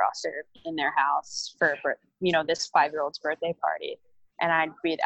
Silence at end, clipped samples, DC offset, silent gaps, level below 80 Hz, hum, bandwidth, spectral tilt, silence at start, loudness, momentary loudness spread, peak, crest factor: 0 s; under 0.1%; under 0.1%; none; -70 dBFS; none; 8.6 kHz; -3.5 dB/octave; 0 s; -27 LUFS; 10 LU; -8 dBFS; 20 dB